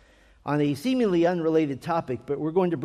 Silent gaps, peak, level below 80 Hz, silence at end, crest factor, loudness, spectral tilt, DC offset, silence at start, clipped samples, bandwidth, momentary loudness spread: none; -12 dBFS; -60 dBFS; 0 s; 14 dB; -25 LUFS; -7.5 dB/octave; under 0.1%; 0.45 s; under 0.1%; 14.5 kHz; 7 LU